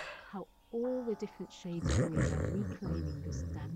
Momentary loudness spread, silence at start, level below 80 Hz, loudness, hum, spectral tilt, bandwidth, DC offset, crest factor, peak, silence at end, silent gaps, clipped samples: 13 LU; 0 s; -48 dBFS; -37 LUFS; none; -6.5 dB/octave; 10 kHz; under 0.1%; 16 dB; -20 dBFS; 0 s; none; under 0.1%